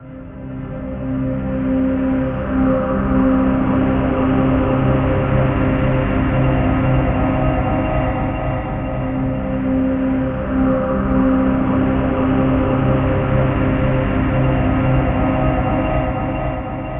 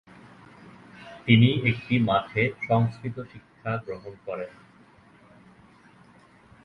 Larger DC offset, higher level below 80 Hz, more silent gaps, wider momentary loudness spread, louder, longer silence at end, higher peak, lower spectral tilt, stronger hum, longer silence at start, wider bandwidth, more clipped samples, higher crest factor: neither; first, -26 dBFS vs -58 dBFS; neither; second, 6 LU vs 21 LU; first, -18 LUFS vs -25 LUFS; second, 0 s vs 2.15 s; about the same, -4 dBFS vs -4 dBFS; about the same, -8 dB/octave vs -8.5 dB/octave; neither; second, 0 s vs 0.65 s; second, 3.7 kHz vs 5.4 kHz; neither; second, 12 dB vs 24 dB